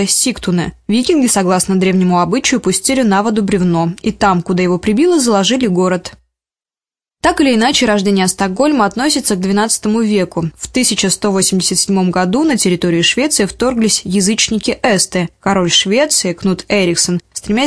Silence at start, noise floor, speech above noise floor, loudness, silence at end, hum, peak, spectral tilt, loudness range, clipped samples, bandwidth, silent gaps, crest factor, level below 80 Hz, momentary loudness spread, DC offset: 0 s; under -90 dBFS; over 77 dB; -13 LUFS; 0 s; none; 0 dBFS; -4 dB/octave; 2 LU; under 0.1%; 11 kHz; none; 14 dB; -42 dBFS; 5 LU; 0.2%